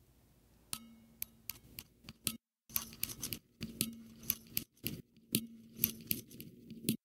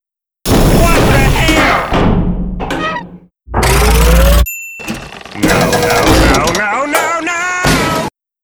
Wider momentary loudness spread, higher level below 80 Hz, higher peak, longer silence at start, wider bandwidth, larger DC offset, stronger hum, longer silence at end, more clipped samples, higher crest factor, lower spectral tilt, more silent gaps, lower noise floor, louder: first, 16 LU vs 13 LU; second, -68 dBFS vs -16 dBFS; second, -6 dBFS vs 0 dBFS; first, 0.75 s vs 0.45 s; second, 17.5 kHz vs over 20 kHz; neither; neither; second, 0.1 s vs 0.35 s; neither; first, 36 dB vs 12 dB; second, -2.5 dB/octave vs -4.5 dB/octave; neither; first, -67 dBFS vs -33 dBFS; second, -40 LUFS vs -11 LUFS